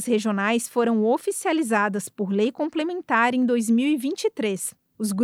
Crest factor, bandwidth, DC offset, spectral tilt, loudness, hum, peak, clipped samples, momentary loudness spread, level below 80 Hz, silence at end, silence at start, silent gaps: 16 dB; 16 kHz; under 0.1%; -4.5 dB/octave; -23 LUFS; none; -8 dBFS; under 0.1%; 7 LU; -76 dBFS; 0 s; 0 s; none